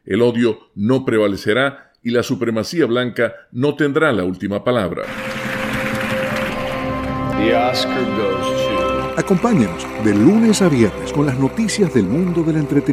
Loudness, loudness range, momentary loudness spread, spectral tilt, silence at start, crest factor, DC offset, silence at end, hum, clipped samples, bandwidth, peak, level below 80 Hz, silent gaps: -18 LUFS; 4 LU; 8 LU; -6 dB/octave; 0.05 s; 16 dB; under 0.1%; 0 s; none; under 0.1%; 15.5 kHz; -2 dBFS; -42 dBFS; none